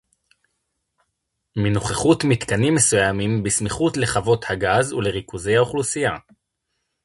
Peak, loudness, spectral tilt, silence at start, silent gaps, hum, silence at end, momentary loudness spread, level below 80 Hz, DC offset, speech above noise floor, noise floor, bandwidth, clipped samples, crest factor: -4 dBFS; -20 LUFS; -4.5 dB/octave; 1.55 s; none; none; 0.85 s; 8 LU; -46 dBFS; under 0.1%; 57 dB; -77 dBFS; 11.5 kHz; under 0.1%; 18 dB